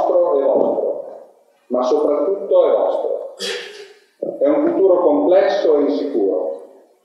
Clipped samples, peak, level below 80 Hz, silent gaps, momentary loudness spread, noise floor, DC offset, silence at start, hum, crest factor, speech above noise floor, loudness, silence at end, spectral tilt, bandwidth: under 0.1%; 0 dBFS; -72 dBFS; none; 14 LU; -47 dBFS; under 0.1%; 0 s; none; 16 dB; 32 dB; -17 LUFS; 0.4 s; -4.5 dB/octave; 11.5 kHz